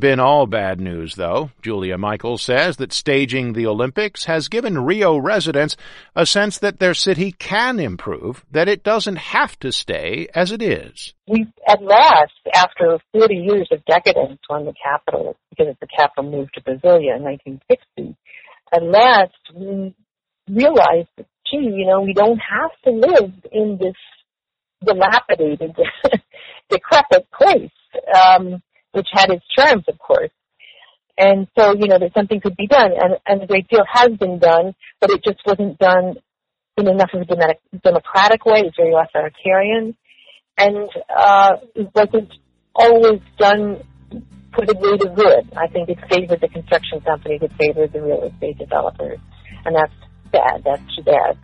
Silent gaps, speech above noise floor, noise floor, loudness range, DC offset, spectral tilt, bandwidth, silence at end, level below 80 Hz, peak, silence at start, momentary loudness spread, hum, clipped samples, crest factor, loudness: none; 71 dB; -86 dBFS; 5 LU; under 0.1%; -5 dB/octave; 11 kHz; 0.1 s; -50 dBFS; 0 dBFS; 0 s; 14 LU; none; under 0.1%; 16 dB; -16 LUFS